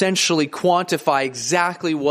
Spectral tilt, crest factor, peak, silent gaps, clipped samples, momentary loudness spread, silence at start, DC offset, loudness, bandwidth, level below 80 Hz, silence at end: -3.5 dB/octave; 16 dB; -4 dBFS; none; under 0.1%; 3 LU; 0 s; under 0.1%; -19 LUFS; 15.5 kHz; -66 dBFS; 0 s